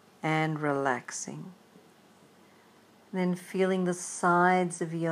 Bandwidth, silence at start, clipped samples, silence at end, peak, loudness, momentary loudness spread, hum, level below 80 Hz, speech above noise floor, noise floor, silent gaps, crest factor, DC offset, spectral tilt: 14.5 kHz; 0.25 s; under 0.1%; 0 s; -10 dBFS; -29 LUFS; 14 LU; none; -86 dBFS; 30 dB; -59 dBFS; none; 20 dB; under 0.1%; -5.5 dB/octave